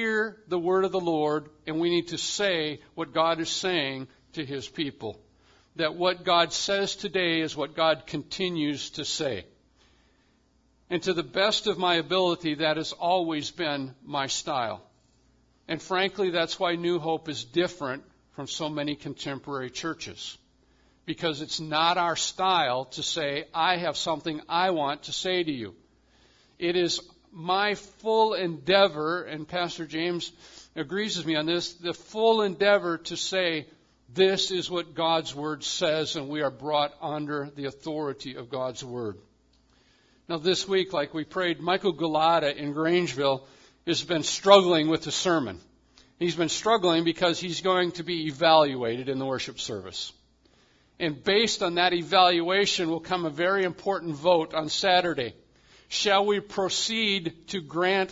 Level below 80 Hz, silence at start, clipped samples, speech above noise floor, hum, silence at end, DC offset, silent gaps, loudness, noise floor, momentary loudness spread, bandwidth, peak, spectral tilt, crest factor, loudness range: -64 dBFS; 0 s; under 0.1%; 39 dB; none; 0 s; under 0.1%; none; -26 LUFS; -65 dBFS; 12 LU; 7.8 kHz; 0 dBFS; -3.5 dB/octave; 26 dB; 7 LU